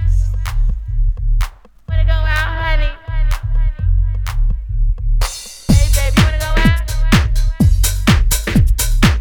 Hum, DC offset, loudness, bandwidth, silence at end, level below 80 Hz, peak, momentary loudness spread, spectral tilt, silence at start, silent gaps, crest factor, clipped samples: none; under 0.1%; -17 LUFS; 19.5 kHz; 0 s; -14 dBFS; 0 dBFS; 8 LU; -5 dB/octave; 0 s; none; 14 dB; under 0.1%